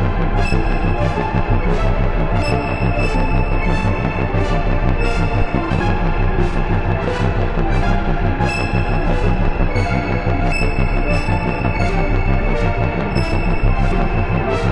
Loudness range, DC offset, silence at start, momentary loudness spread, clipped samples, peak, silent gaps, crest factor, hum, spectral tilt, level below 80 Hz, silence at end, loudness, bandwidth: 0 LU; under 0.1%; 0 s; 1 LU; under 0.1%; -2 dBFS; none; 14 dB; none; -7.5 dB/octave; -18 dBFS; 0 s; -19 LUFS; 8.4 kHz